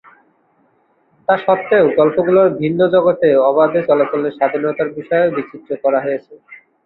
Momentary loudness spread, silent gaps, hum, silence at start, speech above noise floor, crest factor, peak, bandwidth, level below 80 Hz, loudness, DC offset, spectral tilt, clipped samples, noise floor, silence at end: 9 LU; none; none; 1.3 s; 44 dB; 14 dB; -2 dBFS; 4.2 kHz; -60 dBFS; -15 LUFS; under 0.1%; -10.5 dB/octave; under 0.1%; -58 dBFS; 0.3 s